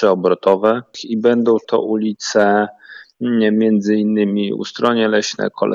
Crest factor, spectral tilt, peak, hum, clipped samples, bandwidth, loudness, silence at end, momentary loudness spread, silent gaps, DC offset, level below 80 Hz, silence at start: 14 dB; -5.5 dB/octave; -2 dBFS; none; under 0.1%; 7.6 kHz; -16 LUFS; 0 s; 7 LU; none; under 0.1%; -70 dBFS; 0 s